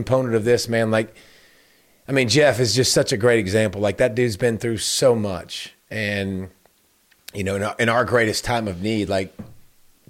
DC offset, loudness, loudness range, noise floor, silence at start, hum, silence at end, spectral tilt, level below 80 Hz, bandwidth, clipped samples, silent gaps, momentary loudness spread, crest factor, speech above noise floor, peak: under 0.1%; -20 LUFS; 5 LU; -60 dBFS; 0 s; none; 0.5 s; -4.5 dB/octave; -50 dBFS; 16.5 kHz; under 0.1%; none; 13 LU; 16 dB; 40 dB; -6 dBFS